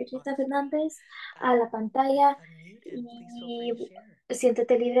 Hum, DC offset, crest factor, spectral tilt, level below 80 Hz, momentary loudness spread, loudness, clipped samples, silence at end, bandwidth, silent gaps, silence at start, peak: none; under 0.1%; 16 dB; -4.5 dB/octave; -78 dBFS; 19 LU; -26 LUFS; under 0.1%; 0 s; 12.5 kHz; none; 0 s; -10 dBFS